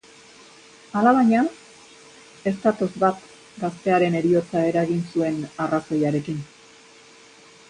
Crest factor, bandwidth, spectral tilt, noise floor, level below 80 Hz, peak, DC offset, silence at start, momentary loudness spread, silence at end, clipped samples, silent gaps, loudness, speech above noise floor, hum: 18 dB; 10.5 kHz; -7 dB/octave; -49 dBFS; -64 dBFS; -6 dBFS; under 0.1%; 0.95 s; 12 LU; 1.25 s; under 0.1%; none; -22 LUFS; 28 dB; none